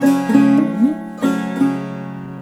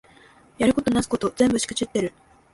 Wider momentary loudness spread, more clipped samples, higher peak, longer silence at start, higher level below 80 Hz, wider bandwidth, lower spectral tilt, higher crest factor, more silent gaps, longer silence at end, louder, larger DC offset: first, 15 LU vs 6 LU; neither; first, 0 dBFS vs -6 dBFS; second, 0 s vs 0.6 s; second, -60 dBFS vs -50 dBFS; first, 13.5 kHz vs 11.5 kHz; first, -7 dB/octave vs -4.5 dB/octave; about the same, 16 dB vs 18 dB; neither; second, 0 s vs 0.45 s; first, -16 LUFS vs -23 LUFS; neither